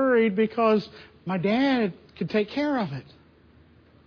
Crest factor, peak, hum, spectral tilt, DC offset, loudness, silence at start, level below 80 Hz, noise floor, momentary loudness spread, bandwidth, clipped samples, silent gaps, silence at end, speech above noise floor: 16 dB; -10 dBFS; none; -8 dB/octave; under 0.1%; -25 LUFS; 0 s; -62 dBFS; -55 dBFS; 14 LU; 5.4 kHz; under 0.1%; none; 1.05 s; 31 dB